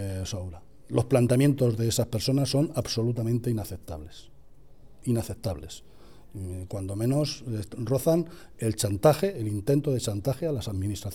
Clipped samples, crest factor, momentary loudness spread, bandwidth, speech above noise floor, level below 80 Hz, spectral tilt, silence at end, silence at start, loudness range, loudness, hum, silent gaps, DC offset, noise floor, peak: under 0.1%; 20 dB; 16 LU; 17 kHz; 27 dB; -50 dBFS; -6 dB/octave; 0 s; 0 s; 8 LU; -27 LUFS; none; none; 0.4%; -54 dBFS; -8 dBFS